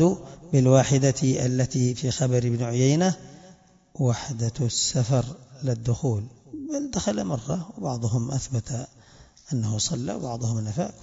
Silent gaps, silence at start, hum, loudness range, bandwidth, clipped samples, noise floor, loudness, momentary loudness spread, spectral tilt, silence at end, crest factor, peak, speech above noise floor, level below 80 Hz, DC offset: none; 0 s; none; 7 LU; 7.8 kHz; under 0.1%; -53 dBFS; -25 LUFS; 11 LU; -5.5 dB/octave; 0.1 s; 20 dB; -6 dBFS; 29 dB; -52 dBFS; under 0.1%